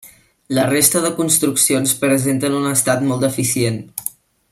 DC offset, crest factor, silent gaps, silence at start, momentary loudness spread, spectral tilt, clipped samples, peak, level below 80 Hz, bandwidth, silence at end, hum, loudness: under 0.1%; 18 dB; none; 0.05 s; 10 LU; -3.5 dB/octave; under 0.1%; 0 dBFS; -56 dBFS; 16.5 kHz; 0.45 s; none; -16 LUFS